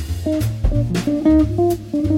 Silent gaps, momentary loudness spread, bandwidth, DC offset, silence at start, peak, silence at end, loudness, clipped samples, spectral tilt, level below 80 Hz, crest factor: none; 6 LU; 17 kHz; under 0.1%; 0 s; -4 dBFS; 0 s; -18 LUFS; under 0.1%; -7.5 dB/octave; -26 dBFS; 12 dB